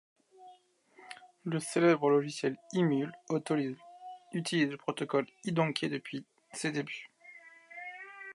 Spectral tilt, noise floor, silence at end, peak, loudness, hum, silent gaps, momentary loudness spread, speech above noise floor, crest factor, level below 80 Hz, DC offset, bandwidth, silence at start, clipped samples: -5.5 dB/octave; -62 dBFS; 0 s; -14 dBFS; -32 LUFS; none; none; 22 LU; 31 dB; 20 dB; -84 dBFS; under 0.1%; 11.5 kHz; 0.4 s; under 0.1%